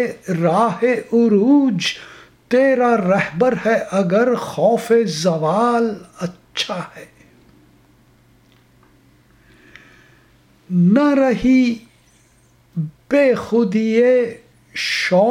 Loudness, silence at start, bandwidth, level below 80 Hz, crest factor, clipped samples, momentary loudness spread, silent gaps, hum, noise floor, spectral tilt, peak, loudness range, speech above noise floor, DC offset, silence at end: -17 LUFS; 0 s; 15.5 kHz; -54 dBFS; 16 dB; under 0.1%; 13 LU; none; none; -54 dBFS; -6 dB/octave; -2 dBFS; 10 LU; 38 dB; under 0.1%; 0 s